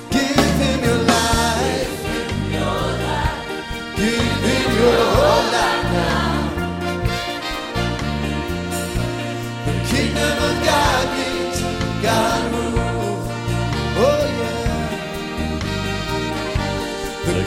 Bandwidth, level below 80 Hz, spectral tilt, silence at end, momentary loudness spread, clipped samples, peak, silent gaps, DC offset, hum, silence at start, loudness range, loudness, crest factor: 16 kHz; -30 dBFS; -4.5 dB/octave; 0 s; 8 LU; under 0.1%; -2 dBFS; none; under 0.1%; none; 0 s; 5 LU; -20 LUFS; 18 dB